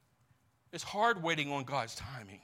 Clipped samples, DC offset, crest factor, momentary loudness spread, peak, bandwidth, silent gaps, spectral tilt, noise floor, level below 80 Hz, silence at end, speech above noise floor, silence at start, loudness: under 0.1%; under 0.1%; 20 dB; 15 LU; -18 dBFS; 16.5 kHz; none; -4 dB/octave; -71 dBFS; -68 dBFS; 0.05 s; 36 dB; 0.75 s; -34 LUFS